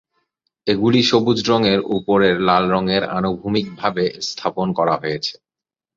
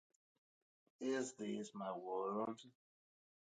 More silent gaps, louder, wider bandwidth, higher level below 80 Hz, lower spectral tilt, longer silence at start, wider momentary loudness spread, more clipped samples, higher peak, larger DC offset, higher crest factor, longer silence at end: neither; first, -18 LUFS vs -45 LUFS; second, 7.6 kHz vs 9 kHz; first, -52 dBFS vs under -90 dBFS; about the same, -5.5 dB/octave vs -4.5 dB/octave; second, 0.65 s vs 1 s; first, 8 LU vs 5 LU; neither; first, 0 dBFS vs -30 dBFS; neither; about the same, 18 dB vs 18 dB; second, 0.65 s vs 0.9 s